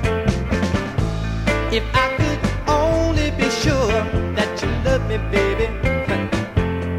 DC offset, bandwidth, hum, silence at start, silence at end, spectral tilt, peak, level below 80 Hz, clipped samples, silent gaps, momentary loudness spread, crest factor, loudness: under 0.1%; 15.5 kHz; none; 0 s; 0 s; -6 dB/octave; -2 dBFS; -28 dBFS; under 0.1%; none; 4 LU; 16 dB; -20 LUFS